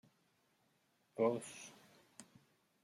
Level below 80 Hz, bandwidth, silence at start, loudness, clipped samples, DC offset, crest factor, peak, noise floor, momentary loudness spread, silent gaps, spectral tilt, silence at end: under -90 dBFS; 14.5 kHz; 1.15 s; -39 LUFS; under 0.1%; under 0.1%; 22 dB; -24 dBFS; -78 dBFS; 23 LU; none; -5 dB/octave; 0.6 s